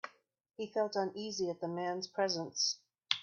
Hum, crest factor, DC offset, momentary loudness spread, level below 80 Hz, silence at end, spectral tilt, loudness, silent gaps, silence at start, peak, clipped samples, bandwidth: none; 26 dB; under 0.1%; 8 LU; -84 dBFS; 0 s; -2.5 dB/octave; -36 LUFS; none; 0.05 s; -12 dBFS; under 0.1%; 7.4 kHz